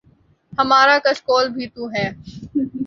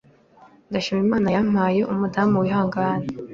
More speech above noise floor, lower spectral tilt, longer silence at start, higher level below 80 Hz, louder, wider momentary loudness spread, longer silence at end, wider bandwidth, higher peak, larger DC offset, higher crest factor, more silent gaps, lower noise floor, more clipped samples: first, 38 dB vs 31 dB; second, -4.5 dB/octave vs -7.5 dB/octave; second, 0.5 s vs 0.7 s; about the same, -54 dBFS vs -54 dBFS; first, -18 LUFS vs -21 LUFS; first, 15 LU vs 6 LU; about the same, 0 s vs 0 s; about the same, 7.6 kHz vs 7.2 kHz; first, -2 dBFS vs -6 dBFS; neither; about the same, 18 dB vs 16 dB; neither; first, -56 dBFS vs -52 dBFS; neither